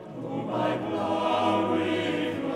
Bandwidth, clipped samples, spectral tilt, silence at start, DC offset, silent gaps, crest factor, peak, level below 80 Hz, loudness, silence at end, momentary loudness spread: 11.5 kHz; under 0.1%; -6 dB/octave; 0 s; under 0.1%; none; 14 dB; -14 dBFS; -66 dBFS; -27 LUFS; 0 s; 6 LU